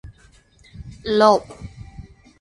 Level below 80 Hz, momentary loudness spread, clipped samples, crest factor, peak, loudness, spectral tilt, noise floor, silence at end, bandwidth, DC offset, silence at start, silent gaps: -46 dBFS; 26 LU; under 0.1%; 22 dB; -2 dBFS; -17 LUFS; -5 dB/octave; -53 dBFS; 0.4 s; 11.5 kHz; under 0.1%; 0.05 s; none